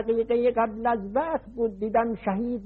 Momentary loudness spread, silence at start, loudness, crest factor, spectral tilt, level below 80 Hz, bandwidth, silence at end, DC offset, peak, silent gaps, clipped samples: 6 LU; 0 s; -26 LUFS; 14 dB; -10.5 dB/octave; -52 dBFS; 4.3 kHz; 0 s; under 0.1%; -12 dBFS; none; under 0.1%